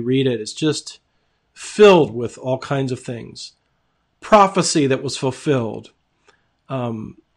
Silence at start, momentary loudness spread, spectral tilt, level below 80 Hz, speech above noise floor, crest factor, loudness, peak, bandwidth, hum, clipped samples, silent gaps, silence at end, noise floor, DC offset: 0 s; 22 LU; -5 dB/octave; -56 dBFS; 49 dB; 18 dB; -18 LUFS; -2 dBFS; 10.5 kHz; none; under 0.1%; none; 0.25 s; -67 dBFS; under 0.1%